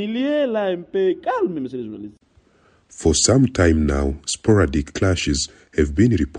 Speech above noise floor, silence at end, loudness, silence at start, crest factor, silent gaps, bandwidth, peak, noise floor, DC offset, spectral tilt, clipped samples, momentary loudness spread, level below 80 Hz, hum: 38 dB; 0 s; -19 LUFS; 0 s; 18 dB; none; 11.5 kHz; -2 dBFS; -57 dBFS; under 0.1%; -5 dB/octave; under 0.1%; 11 LU; -32 dBFS; none